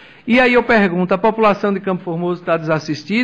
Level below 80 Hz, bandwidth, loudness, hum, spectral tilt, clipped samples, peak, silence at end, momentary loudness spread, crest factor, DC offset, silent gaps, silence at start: -48 dBFS; 8.8 kHz; -16 LUFS; none; -7 dB/octave; under 0.1%; -4 dBFS; 0 s; 9 LU; 12 dB; under 0.1%; none; 0.25 s